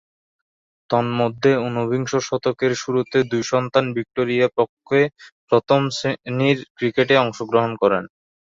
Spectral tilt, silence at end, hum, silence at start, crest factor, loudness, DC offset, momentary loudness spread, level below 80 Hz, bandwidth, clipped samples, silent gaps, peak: -5.5 dB/octave; 0.4 s; none; 0.9 s; 18 dB; -20 LUFS; under 0.1%; 6 LU; -60 dBFS; 7.8 kHz; under 0.1%; 4.69-4.77 s, 5.32-5.47 s, 6.70-6.75 s; -2 dBFS